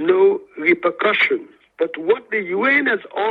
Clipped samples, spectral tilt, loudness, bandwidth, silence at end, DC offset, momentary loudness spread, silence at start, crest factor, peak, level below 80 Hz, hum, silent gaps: under 0.1%; -6.5 dB/octave; -18 LUFS; 4.9 kHz; 0 s; under 0.1%; 8 LU; 0 s; 16 dB; -4 dBFS; -72 dBFS; none; none